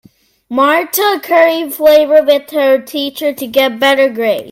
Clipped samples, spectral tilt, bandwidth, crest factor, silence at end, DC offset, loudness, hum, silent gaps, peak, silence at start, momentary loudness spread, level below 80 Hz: under 0.1%; -2.5 dB/octave; 17 kHz; 12 dB; 0 s; under 0.1%; -12 LUFS; none; none; 0 dBFS; 0.5 s; 8 LU; -56 dBFS